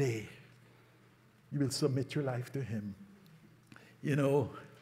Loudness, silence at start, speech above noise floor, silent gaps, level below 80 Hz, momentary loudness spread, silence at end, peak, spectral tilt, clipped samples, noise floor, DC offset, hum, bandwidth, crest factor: -35 LUFS; 0 s; 30 dB; none; -74 dBFS; 20 LU; 0.05 s; -18 dBFS; -6 dB/octave; under 0.1%; -64 dBFS; under 0.1%; none; 15.5 kHz; 18 dB